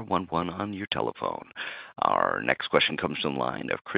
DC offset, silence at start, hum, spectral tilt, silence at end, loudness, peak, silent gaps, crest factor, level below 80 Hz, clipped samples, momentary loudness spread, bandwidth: under 0.1%; 0 s; none; -8.5 dB/octave; 0 s; -28 LUFS; -4 dBFS; none; 24 dB; -62 dBFS; under 0.1%; 11 LU; 5.2 kHz